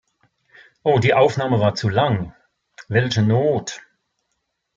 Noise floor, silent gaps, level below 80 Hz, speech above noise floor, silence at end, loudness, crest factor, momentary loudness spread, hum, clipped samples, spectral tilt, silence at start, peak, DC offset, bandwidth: -75 dBFS; none; -56 dBFS; 57 dB; 1 s; -19 LUFS; 18 dB; 10 LU; none; under 0.1%; -6 dB/octave; 0.85 s; -2 dBFS; under 0.1%; 7.6 kHz